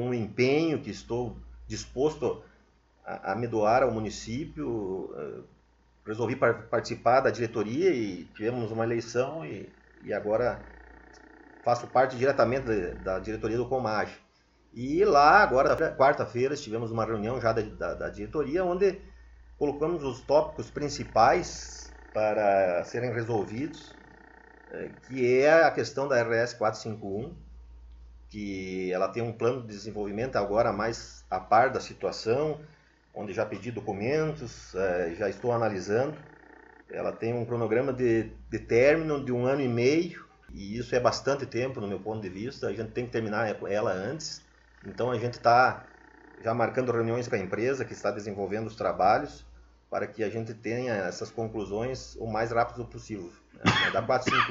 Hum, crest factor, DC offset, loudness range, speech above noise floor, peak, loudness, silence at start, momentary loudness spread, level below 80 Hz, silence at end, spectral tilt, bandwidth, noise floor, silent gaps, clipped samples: none; 24 dB; under 0.1%; 7 LU; 35 dB; -6 dBFS; -28 LUFS; 0 s; 15 LU; -54 dBFS; 0 s; -5.5 dB/octave; 7.8 kHz; -63 dBFS; none; under 0.1%